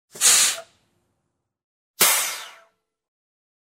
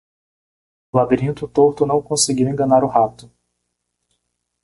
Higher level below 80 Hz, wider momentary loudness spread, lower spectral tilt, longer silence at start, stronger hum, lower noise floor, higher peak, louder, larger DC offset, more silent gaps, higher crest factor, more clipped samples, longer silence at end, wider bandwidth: second, -78 dBFS vs -52 dBFS; first, 17 LU vs 6 LU; second, 2 dB/octave vs -5 dB/octave; second, 0.15 s vs 0.95 s; second, none vs 60 Hz at -40 dBFS; about the same, -77 dBFS vs -75 dBFS; about the same, -2 dBFS vs -2 dBFS; about the same, -17 LUFS vs -17 LUFS; neither; first, 1.64-1.94 s vs none; about the same, 22 dB vs 18 dB; neither; second, 1.25 s vs 1.55 s; first, 16.5 kHz vs 11.5 kHz